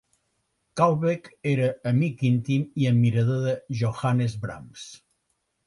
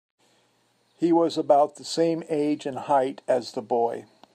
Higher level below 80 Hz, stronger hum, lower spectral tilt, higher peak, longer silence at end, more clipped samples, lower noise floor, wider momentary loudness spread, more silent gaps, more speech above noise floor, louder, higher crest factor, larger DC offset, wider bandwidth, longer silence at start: first, -58 dBFS vs -80 dBFS; neither; first, -7.5 dB/octave vs -5.5 dB/octave; about the same, -6 dBFS vs -8 dBFS; first, 0.7 s vs 0.3 s; neither; first, -75 dBFS vs -66 dBFS; first, 15 LU vs 7 LU; neither; first, 51 dB vs 43 dB; about the same, -24 LUFS vs -24 LUFS; about the same, 18 dB vs 18 dB; neither; about the same, 11 kHz vs 12 kHz; second, 0.75 s vs 1 s